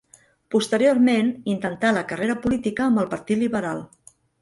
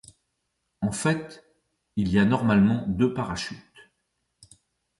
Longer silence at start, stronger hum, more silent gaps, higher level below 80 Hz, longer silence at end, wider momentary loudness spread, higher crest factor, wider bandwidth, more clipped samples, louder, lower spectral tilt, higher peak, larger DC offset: second, 0.5 s vs 0.8 s; neither; neither; second, -56 dBFS vs -50 dBFS; second, 0.55 s vs 1.4 s; second, 8 LU vs 14 LU; about the same, 16 dB vs 16 dB; about the same, 11.5 kHz vs 11.5 kHz; neither; first, -22 LUFS vs -25 LUFS; about the same, -5.5 dB/octave vs -6 dB/octave; first, -6 dBFS vs -10 dBFS; neither